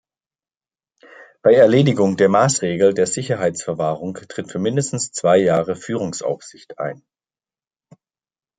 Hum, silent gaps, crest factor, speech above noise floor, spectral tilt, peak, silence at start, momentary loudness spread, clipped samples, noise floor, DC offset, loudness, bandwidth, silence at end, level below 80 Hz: none; none; 18 dB; over 72 dB; -5 dB/octave; -2 dBFS; 1.2 s; 15 LU; under 0.1%; under -90 dBFS; under 0.1%; -18 LUFS; 9.6 kHz; 1.65 s; -62 dBFS